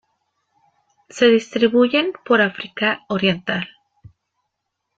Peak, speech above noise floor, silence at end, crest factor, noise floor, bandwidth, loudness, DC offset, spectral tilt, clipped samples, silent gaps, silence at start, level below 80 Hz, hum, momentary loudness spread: -2 dBFS; 60 dB; 1.3 s; 18 dB; -77 dBFS; 7.8 kHz; -18 LUFS; under 0.1%; -5 dB/octave; under 0.1%; none; 1.15 s; -62 dBFS; none; 10 LU